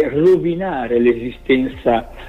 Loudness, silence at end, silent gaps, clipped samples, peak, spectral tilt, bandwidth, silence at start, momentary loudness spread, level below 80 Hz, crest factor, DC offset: -17 LUFS; 0 s; none; under 0.1%; -4 dBFS; -8 dB/octave; 5.2 kHz; 0 s; 7 LU; -40 dBFS; 14 dB; under 0.1%